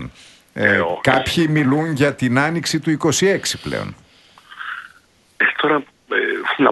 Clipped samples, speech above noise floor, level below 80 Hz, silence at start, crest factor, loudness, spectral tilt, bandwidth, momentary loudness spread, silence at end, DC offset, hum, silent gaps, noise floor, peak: under 0.1%; 35 dB; -50 dBFS; 0 s; 18 dB; -18 LUFS; -4.5 dB/octave; 12 kHz; 14 LU; 0 s; under 0.1%; none; none; -53 dBFS; 0 dBFS